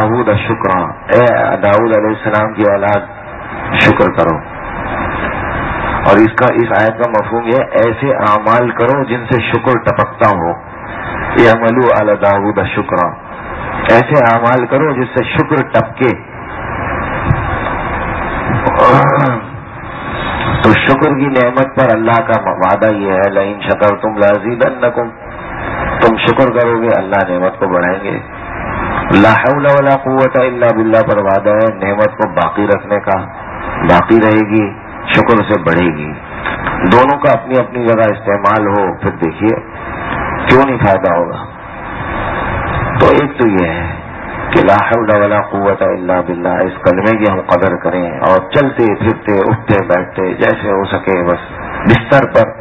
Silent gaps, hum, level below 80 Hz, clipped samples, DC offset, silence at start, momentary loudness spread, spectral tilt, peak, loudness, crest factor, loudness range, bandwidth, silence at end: none; none; -32 dBFS; 0.5%; under 0.1%; 0 s; 12 LU; -8.5 dB/octave; 0 dBFS; -12 LUFS; 12 dB; 3 LU; 8 kHz; 0 s